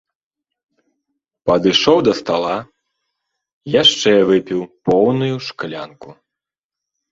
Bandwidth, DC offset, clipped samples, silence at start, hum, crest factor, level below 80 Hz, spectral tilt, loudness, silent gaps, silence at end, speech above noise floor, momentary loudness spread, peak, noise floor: 7.8 kHz; under 0.1%; under 0.1%; 1.45 s; none; 18 dB; -54 dBFS; -4.5 dB/octave; -15 LUFS; 3.53-3.61 s; 1 s; 70 dB; 15 LU; 0 dBFS; -86 dBFS